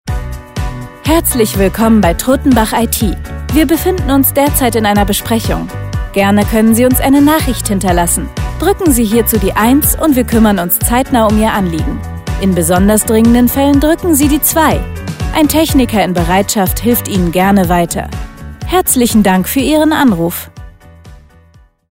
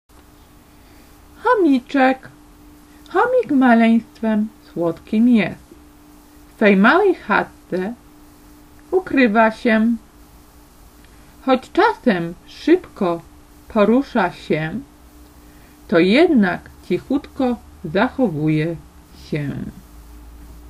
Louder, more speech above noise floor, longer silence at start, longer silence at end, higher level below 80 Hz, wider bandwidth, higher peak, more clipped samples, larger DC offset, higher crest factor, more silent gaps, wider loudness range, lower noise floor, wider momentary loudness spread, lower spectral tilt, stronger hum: first, -11 LUFS vs -18 LUFS; first, 34 dB vs 30 dB; second, 0.05 s vs 1.45 s; first, 0.8 s vs 0 s; first, -22 dBFS vs -48 dBFS; first, 16.5 kHz vs 14 kHz; about the same, 0 dBFS vs 0 dBFS; neither; neither; second, 10 dB vs 18 dB; neither; about the same, 2 LU vs 3 LU; about the same, -44 dBFS vs -47 dBFS; about the same, 12 LU vs 14 LU; second, -5 dB/octave vs -7 dB/octave; neither